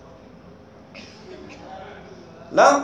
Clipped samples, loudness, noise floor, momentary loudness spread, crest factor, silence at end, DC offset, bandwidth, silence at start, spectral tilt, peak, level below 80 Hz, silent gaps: under 0.1%; -18 LUFS; -46 dBFS; 28 LU; 22 dB; 0 s; under 0.1%; 10.5 kHz; 0.95 s; -3.5 dB/octave; -2 dBFS; -58 dBFS; none